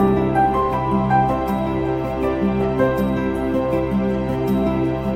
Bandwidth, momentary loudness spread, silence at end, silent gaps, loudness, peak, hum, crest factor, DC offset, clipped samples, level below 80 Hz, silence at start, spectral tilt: 15.5 kHz; 4 LU; 0 s; none; -20 LUFS; -6 dBFS; none; 14 dB; under 0.1%; under 0.1%; -34 dBFS; 0 s; -8.5 dB/octave